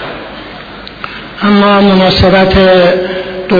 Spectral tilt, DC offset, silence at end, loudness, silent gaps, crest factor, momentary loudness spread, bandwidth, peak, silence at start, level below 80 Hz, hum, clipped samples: -7.5 dB/octave; under 0.1%; 0 s; -7 LUFS; none; 8 dB; 19 LU; 5.4 kHz; 0 dBFS; 0 s; -26 dBFS; none; 0.2%